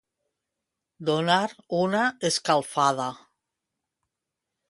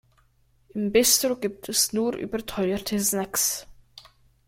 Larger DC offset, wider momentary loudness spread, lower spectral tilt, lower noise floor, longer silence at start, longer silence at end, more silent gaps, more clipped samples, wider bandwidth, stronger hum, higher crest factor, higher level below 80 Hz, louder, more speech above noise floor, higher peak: neither; second, 8 LU vs 12 LU; first, -4 dB/octave vs -2.5 dB/octave; first, -85 dBFS vs -63 dBFS; first, 1 s vs 0.75 s; first, 1.5 s vs 0.45 s; neither; neither; second, 11.5 kHz vs 16.5 kHz; neither; about the same, 22 dB vs 22 dB; second, -72 dBFS vs -54 dBFS; about the same, -25 LUFS vs -24 LUFS; first, 61 dB vs 38 dB; about the same, -6 dBFS vs -6 dBFS